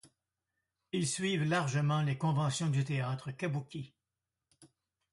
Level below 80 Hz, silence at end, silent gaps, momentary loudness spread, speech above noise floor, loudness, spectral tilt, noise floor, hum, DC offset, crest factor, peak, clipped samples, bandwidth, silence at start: -72 dBFS; 0.5 s; none; 9 LU; over 57 dB; -33 LUFS; -5.5 dB/octave; under -90 dBFS; none; under 0.1%; 18 dB; -18 dBFS; under 0.1%; 11.5 kHz; 0.05 s